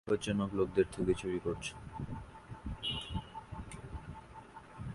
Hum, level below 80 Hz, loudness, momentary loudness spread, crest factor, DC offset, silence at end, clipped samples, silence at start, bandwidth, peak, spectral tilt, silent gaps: none; -52 dBFS; -38 LUFS; 18 LU; 22 dB; under 0.1%; 0 s; under 0.1%; 0.05 s; 11.5 kHz; -16 dBFS; -5.5 dB/octave; none